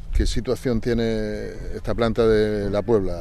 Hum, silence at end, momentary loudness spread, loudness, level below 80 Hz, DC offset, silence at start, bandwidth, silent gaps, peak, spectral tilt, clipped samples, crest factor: none; 0 s; 11 LU; -23 LUFS; -28 dBFS; under 0.1%; 0.05 s; 13.5 kHz; none; -6 dBFS; -6.5 dB/octave; under 0.1%; 14 dB